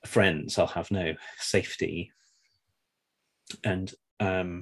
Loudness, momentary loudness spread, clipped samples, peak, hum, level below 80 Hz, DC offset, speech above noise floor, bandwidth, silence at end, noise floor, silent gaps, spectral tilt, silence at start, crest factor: -29 LUFS; 13 LU; under 0.1%; -10 dBFS; none; -52 dBFS; under 0.1%; 52 dB; 12.5 kHz; 0 s; -81 dBFS; 4.11-4.17 s; -5 dB/octave; 0.05 s; 22 dB